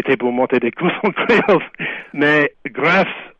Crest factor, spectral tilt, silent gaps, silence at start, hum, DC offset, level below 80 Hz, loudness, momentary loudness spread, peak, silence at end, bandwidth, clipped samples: 14 dB; -7 dB/octave; none; 0 s; none; under 0.1%; -56 dBFS; -16 LUFS; 7 LU; -2 dBFS; 0.1 s; 8 kHz; under 0.1%